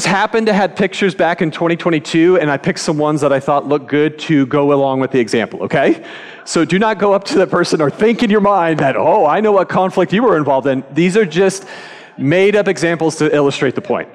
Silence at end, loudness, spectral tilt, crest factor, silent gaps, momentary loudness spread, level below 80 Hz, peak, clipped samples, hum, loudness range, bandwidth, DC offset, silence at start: 0.05 s; -14 LUFS; -5.5 dB/octave; 10 dB; none; 5 LU; -54 dBFS; -2 dBFS; under 0.1%; none; 2 LU; 12 kHz; under 0.1%; 0 s